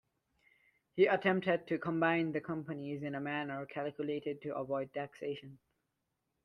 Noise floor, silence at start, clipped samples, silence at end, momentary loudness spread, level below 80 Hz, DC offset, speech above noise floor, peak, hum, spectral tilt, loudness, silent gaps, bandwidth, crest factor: -85 dBFS; 0.95 s; under 0.1%; 0.9 s; 11 LU; -78 dBFS; under 0.1%; 49 dB; -16 dBFS; none; -8 dB/octave; -36 LUFS; none; 6.2 kHz; 20 dB